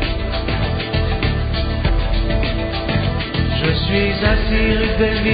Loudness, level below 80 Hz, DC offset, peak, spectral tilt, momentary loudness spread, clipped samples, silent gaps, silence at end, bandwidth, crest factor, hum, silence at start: -19 LUFS; -22 dBFS; under 0.1%; -2 dBFS; -4.5 dB/octave; 4 LU; under 0.1%; none; 0 s; 5 kHz; 14 dB; none; 0 s